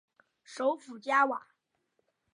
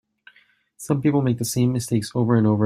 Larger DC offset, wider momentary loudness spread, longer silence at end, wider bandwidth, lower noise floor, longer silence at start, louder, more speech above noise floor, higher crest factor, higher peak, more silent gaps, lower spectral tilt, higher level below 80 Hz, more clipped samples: neither; first, 13 LU vs 6 LU; first, 0.95 s vs 0 s; second, 11 kHz vs 15.5 kHz; first, -78 dBFS vs -59 dBFS; second, 0.5 s vs 0.8 s; second, -30 LUFS vs -21 LUFS; first, 48 dB vs 39 dB; about the same, 20 dB vs 16 dB; second, -14 dBFS vs -6 dBFS; neither; second, -3 dB/octave vs -6.5 dB/octave; second, under -90 dBFS vs -56 dBFS; neither